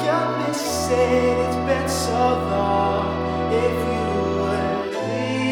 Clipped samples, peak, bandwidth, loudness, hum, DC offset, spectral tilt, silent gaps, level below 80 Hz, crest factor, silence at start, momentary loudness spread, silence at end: under 0.1%; -6 dBFS; 19.5 kHz; -21 LUFS; none; under 0.1%; -5 dB/octave; none; -40 dBFS; 14 dB; 0 s; 5 LU; 0 s